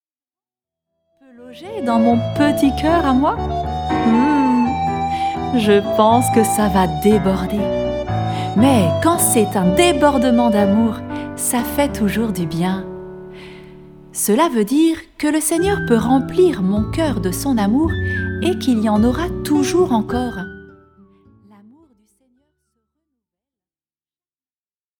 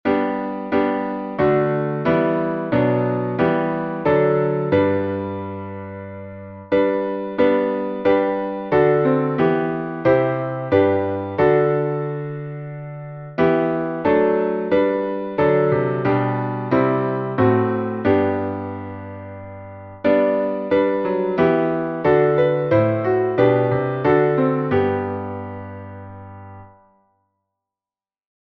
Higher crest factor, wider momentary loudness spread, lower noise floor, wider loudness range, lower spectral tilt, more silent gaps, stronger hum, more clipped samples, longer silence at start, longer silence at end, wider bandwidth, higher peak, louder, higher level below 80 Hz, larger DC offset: about the same, 18 dB vs 16 dB; second, 8 LU vs 16 LU; about the same, under -90 dBFS vs under -90 dBFS; about the same, 5 LU vs 4 LU; second, -5.5 dB/octave vs -10 dB/octave; neither; neither; neither; first, 1.4 s vs 0.05 s; first, 4.3 s vs 1.9 s; first, 19.5 kHz vs 5.6 kHz; about the same, 0 dBFS vs -2 dBFS; about the same, -17 LUFS vs -19 LUFS; first, -36 dBFS vs -52 dBFS; neither